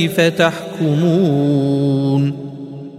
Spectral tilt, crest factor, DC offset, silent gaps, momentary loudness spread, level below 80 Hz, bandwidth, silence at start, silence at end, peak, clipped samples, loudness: -7 dB/octave; 16 dB; under 0.1%; none; 11 LU; -60 dBFS; 15 kHz; 0 s; 0 s; 0 dBFS; under 0.1%; -16 LUFS